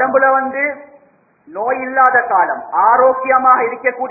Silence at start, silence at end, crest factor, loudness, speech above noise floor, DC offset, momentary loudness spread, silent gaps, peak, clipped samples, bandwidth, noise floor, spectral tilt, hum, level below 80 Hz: 0 s; 0 s; 14 dB; -13 LUFS; 39 dB; under 0.1%; 9 LU; none; 0 dBFS; under 0.1%; 2.7 kHz; -53 dBFS; -9 dB/octave; none; -62 dBFS